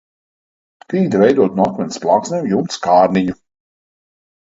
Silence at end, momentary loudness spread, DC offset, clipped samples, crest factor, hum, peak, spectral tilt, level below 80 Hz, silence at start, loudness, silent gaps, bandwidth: 1.1 s; 9 LU; under 0.1%; under 0.1%; 16 dB; none; 0 dBFS; -6.5 dB/octave; -54 dBFS; 0.9 s; -15 LUFS; none; 7.8 kHz